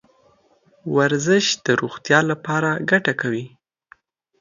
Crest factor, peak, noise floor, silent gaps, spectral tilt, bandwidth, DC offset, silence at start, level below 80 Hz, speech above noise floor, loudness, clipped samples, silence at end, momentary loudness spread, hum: 20 dB; 0 dBFS; -58 dBFS; none; -4.5 dB/octave; 7.6 kHz; under 0.1%; 0.85 s; -66 dBFS; 39 dB; -19 LUFS; under 0.1%; 0.95 s; 9 LU; none